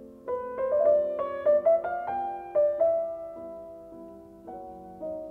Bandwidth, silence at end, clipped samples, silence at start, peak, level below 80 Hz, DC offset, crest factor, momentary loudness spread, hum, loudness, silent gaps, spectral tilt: 3.6 kHz; 0 s; under 0.1%; 0 s; -12 dBFS; -64 dBFS; under 0.1%; 16 dB; 21 LU; none; -27 LUFS; none; -7.5 dB/octave